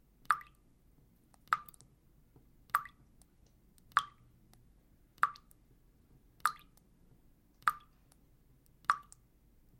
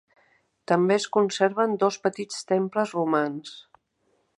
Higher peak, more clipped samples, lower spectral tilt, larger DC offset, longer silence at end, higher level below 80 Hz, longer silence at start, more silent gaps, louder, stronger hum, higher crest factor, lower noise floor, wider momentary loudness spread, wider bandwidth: second, -10 dBFS vs -6 dBFS; neither; second, -1 dB/octave vs -5 dB/octave; neither; about the same, 0.8 s vs 0.75 s; first, -68 dBFS vs -78 dBFS; second, 0.3 s vs 0.7 s; neither; second, -37 LUFS vs -24 LUFS; neither; first, 32 dB vs 20 dB; second, -66 dBFS vs -70 dBFS; first, 20 LU vs 9 LU; first, 16.5 kHz vs 11.5 kHz